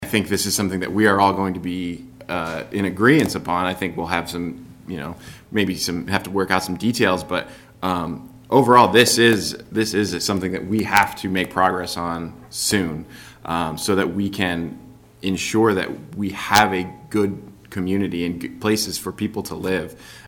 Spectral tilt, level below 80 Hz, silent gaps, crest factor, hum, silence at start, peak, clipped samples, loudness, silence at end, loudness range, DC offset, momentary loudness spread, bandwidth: -4 dB/octave; -50 dBFS; none; 20 dB; none; 0 s; 0 dBFS; under 0.1%; -20 LUFS; 0 s; 6 LU; under 0.1%; 15 LU; 17 kHz